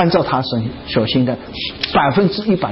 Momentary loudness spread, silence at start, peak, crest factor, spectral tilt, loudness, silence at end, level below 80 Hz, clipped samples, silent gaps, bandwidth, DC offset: 8 LU; 0 s; -4 dBFS; 14 dB; -10 dB/octave; -17 LUFS; 0 s; -42 dBFS; under 0.1%; none; 5.8 kHz; under 0.1%